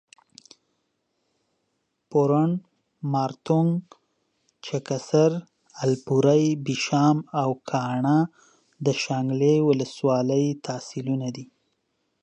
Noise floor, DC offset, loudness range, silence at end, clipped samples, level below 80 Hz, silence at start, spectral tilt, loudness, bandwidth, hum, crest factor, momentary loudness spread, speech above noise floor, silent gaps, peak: -75 dBFS; under 0.1%; 3 LU; 0.8 s; under 0.1%; -72 dBFS; 2.1 s; -6.5 dB/octave; -24 LUFS; 9.2 kHz; none; 18 dB; 12 LU; 53 dB; none; -8 dBFS